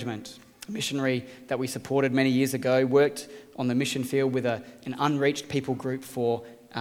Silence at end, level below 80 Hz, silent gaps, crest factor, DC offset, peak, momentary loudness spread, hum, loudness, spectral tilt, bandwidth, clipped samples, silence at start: 0 s; -68 dBFS; none; 18 dB; under 0.1%; -8 dBFS; 15 LU; none; -27 LUFS; -5.5 dB/octave; 16.5 kHz; under 0.1%; 0 s